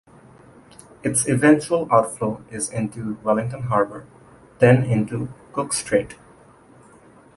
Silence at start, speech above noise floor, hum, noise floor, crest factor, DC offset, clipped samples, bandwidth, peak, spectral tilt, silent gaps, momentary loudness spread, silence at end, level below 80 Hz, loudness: 1.05 s; 29 dB; none; -50 dBFS; 20 dB; under 0.1%; under 0.1%; 11.5 kHz; -2 dBFS; -5.5 dB/octave; none; 13 LU; 1.2 s; -54 dBFS; -21 LUFS